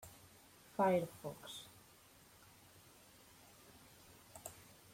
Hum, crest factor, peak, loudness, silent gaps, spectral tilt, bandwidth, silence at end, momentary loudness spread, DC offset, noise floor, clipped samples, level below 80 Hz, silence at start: none; 24 dB; -22 dBFS; -41 LUFS; none; -5 dB/octave; 16.5 kHz; 0.3 s; 26 LU; under 0.1%; -65 dBFS; under 0.1%; -76 dBFS; 0 s